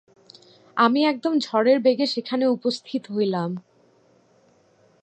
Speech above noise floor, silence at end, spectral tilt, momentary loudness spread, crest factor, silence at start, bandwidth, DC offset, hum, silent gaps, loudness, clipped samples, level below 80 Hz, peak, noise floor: 38 dB; 1.4 s; -6 dB/octave; 11 LU; 20 dB; 0.75 s; 8.8 kHz; under 0.1%; none; none; -22 LUFS; under 0.1%; -80 dBFS; -4 dBFS; -59 dBFS